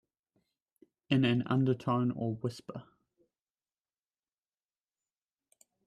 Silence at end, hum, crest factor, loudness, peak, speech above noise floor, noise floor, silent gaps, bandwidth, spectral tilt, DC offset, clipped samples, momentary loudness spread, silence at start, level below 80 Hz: 3.05 s; none; 22 dB; -31 LUFS; -14 dBFS; over 59 dB; under -90 dBFS; none; 10.5 kHz; -8 dB/octave; under 0.1%; under 0.1%; 18 LU; 1.1 s; -72 dBFS